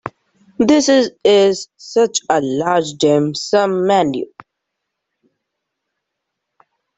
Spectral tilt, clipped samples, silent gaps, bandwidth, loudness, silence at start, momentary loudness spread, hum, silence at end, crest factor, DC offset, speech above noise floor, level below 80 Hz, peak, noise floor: -4.5 dB/octave; under 0.1%; none; 8.4 kHz; -15 LUFS; 0.05 s; 9 LU; none; 2.75 s; 16 dB; under 0.1%; 63 dB; -58 dBFS; -2 dBFS; -77 dBFS